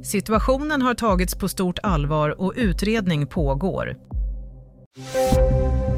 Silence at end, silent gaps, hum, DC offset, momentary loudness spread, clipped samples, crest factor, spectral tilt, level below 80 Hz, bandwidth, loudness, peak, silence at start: 0 s; 4.86-4.91 s; none; under 0.1%; 11 LU; under 0.1%; 16 dB; -6 dB/octave; -28 dBFS; 16 kHz; -22 LUFS; -6 dBFS; 0 s